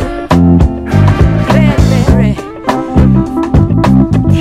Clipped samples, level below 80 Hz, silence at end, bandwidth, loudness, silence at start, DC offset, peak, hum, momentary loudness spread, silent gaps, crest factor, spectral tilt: 2%; -16 dBFS; 0 s; 13.5 kHz; -9 LUFS; 0 s; under 0.1%; 0 dBFS; none; 4 LU; none; 8 dB; -8 dB/octave